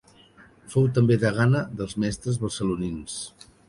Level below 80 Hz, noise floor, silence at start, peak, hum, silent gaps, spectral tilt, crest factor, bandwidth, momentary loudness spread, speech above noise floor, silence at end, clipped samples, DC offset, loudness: -50 dBFS; -53 dBFS; 0.65 s; -8 dBFS; none; none; -6.5 dB/octave; 16 dB; 11.5 kHz; 13 LU; 30 dB; 0.4 s; under 0.1%; under 0.1%; -25 LUFS